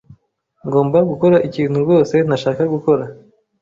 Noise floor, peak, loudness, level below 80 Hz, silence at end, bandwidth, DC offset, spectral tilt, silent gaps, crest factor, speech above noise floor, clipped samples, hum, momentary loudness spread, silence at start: -59 dBFS; -2 dBFS; -16 LUFS; -54 dBFS; 0.45 s; 7.6 kHz; under 0.1%; -8 dB/octave; none; 14 dB; 45 dB; under 0.1%; none; 6 LU; 0.1 s